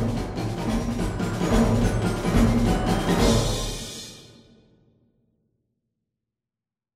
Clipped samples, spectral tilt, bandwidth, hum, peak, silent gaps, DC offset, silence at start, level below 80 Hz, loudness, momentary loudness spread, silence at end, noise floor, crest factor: under 0.1%; -5.5 dB/octave; 16 kHz; none; -6 dBFS; none; under 0.1%; 0 s; -32 dBFS; -24 LUFS; 11 LU; 2.7 s; under -90 dBFS; 18 dB